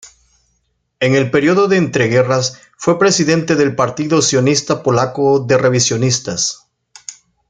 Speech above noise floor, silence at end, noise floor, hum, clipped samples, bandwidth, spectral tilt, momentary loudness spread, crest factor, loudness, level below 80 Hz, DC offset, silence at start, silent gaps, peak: 52 dB; 0.4 s; -65 dBFS; none; under 0.1%; 9.6 kHz; -4.5 dB/octave; 8 LU; 14 dB; -14 LUFS; -54 dBFS; under 0.1%; 0.05 s; none; 0 dBFS